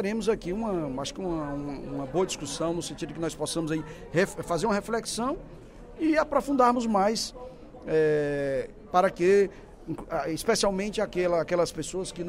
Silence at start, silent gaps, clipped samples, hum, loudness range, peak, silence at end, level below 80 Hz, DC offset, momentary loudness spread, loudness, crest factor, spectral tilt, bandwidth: 0 s; none; under 0.1%; none; 5 LU; -8 dBFS; 0 s; -50 dBFS; under 0.1%; 12 LU; -28 LUFS; 18 dB; -4.5 dB/octave; 16 kHz